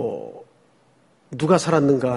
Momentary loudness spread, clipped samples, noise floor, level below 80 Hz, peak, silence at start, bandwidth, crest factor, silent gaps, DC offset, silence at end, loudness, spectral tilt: 20 LU; under 0.1%; -59 dBFS; -60 dBFS; -2 dBFS; 0 s; 11.5 kHz; 20 dB; none; under 0.1%; 0 s; -19 LUFS; -6.5 dB/octave